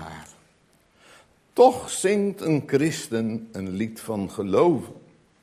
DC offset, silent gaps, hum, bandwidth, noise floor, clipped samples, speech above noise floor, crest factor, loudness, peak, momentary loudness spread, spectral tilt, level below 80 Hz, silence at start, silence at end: under 0.1%; none; none; 15.5 kHz; -61 dBFS; under 0.1%; 39 dB; 22 dB; -23 LUFS; -4 dBFS; 14 LU; -5.5 dB/octave; -58 dBFS; 0 s; 0.45 s